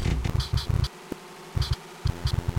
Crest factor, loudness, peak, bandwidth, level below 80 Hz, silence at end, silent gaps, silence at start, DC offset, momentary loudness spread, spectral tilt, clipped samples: 14 dB; -29 LUFS; -14 dBFS; 16.5 kHz; -32 dBFS; 0 s; none; 0 s; under 0.1%; 12 LU; -5.5 dB/octave; under 0.1%